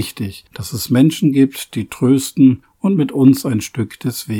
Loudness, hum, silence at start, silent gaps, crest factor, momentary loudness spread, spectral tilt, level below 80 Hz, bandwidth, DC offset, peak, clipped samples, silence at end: -15 LUFS; none; 0 s; none; 16 dB; 13 LU; -6 dB/octave; -52 dBFS; 18 kHz; under 0.1%; 0 dBFS; under 0.1%; 0 s